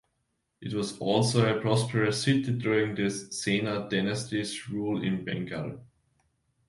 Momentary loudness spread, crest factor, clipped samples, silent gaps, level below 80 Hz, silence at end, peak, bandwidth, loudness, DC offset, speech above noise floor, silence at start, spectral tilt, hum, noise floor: 10 LU; 20 dB; under 0.1%; none; -62 dBFS; 0.85 s; -10 dBFS; 11.5 kHz; -28 LUFS; under 0.1%; 50 dB; 0.6 s; -5.5 dB/octave; none; -78 dBFS